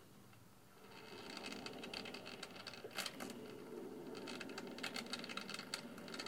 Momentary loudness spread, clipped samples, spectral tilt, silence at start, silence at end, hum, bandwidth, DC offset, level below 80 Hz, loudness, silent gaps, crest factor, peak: 14 LU; under 0.1%; -3 dB/octave; 0 s; 0 s; none; 17.5 kHz; under 0.1%; -80 dBFS; -48 LUFS; none; 24 dB; -28 dBFS